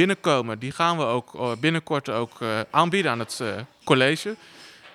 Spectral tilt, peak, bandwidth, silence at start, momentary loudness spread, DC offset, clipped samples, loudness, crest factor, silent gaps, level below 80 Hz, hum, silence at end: -5 dB/octave; -4 dBFS; 15 kHz; 0 s; 10 LU; under 0.1%; under 0.1%; -24 LUFS; 20 dB; none; -70 dBFS; none; 0.05 s